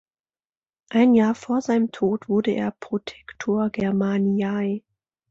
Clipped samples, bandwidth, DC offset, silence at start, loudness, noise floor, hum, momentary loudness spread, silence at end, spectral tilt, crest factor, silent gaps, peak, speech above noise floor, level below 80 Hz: under 0.1%; 7.6 kHz; under 0.1%; 0.9 s; -23 LUFS; under -90 dBFS; none; 12 LU; 0.5 s; -7 dB/octave; 16 dB; none; -6 dBFS; over 68 dB; -60 dBFS